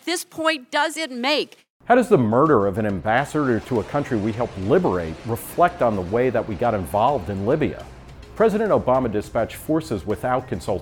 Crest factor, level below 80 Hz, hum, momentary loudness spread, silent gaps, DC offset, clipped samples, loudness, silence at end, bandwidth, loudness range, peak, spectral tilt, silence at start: 18 dB; -46 dBFS; none; 9 LU; 1.70-1.80 s; under 0.1%; under 0.1%; -21 LUFS; 0 s; 19 kHz; 2 LU; -2 dBFS; -6 dB/octave; 0.05 s